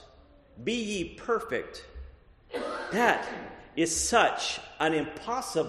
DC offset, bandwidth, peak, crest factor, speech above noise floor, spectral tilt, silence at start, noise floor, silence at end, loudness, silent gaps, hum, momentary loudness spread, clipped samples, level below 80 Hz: under 0.1%; 13 kHz; -8 dBFS; 22 dB; 27 dB; -2.5 dB/octave; 0 s; -56 dBFS; 0 s; -29 LUFS; none; none; 17 LU; under 0.1%; -54 dBFS